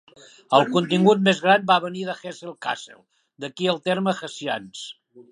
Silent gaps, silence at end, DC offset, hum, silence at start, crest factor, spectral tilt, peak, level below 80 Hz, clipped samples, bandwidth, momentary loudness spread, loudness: none; 0.1 s; under 0.1%; none; 0.5 s; 22 dB; -5 dB/octave; 0 dBFS; -72 dBFS; under 0.1%; 11 kHz; 18 LU; -22 LUFS